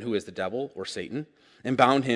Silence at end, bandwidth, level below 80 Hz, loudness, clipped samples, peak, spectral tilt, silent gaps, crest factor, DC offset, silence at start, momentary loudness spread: 0 s; 11.5 kHz; -68 dBFS; -28 LUFS; under 0.1%; -4 dBFS; -5.5 dB/octave; none; 24 dB; under 0.1%; 0 s; 16 LU